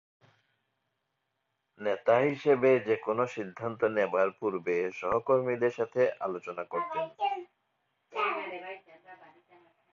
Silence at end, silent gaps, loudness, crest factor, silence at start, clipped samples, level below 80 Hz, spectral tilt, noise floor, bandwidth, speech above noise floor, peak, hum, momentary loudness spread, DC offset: 0.75 s; none; -30 LUFS; 20 dB; 1.8 s; under 0.1%; -72 dBFS; -6.5 dB/octave; -81 dBFS; 7.4 kHz; 53 dB; -12 dBFS; none; 12 LU; under 0.1%